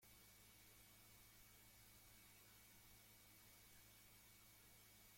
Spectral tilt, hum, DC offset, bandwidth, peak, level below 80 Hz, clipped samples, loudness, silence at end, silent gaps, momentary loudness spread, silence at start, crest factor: -2 dB/octave; none; under 0.1%; 16.5 kHz; -54 dBFS; -80 dBFS; under 0.1%; -66 LUFS; 0 s; none; 1 LU; 0 s; 14 dB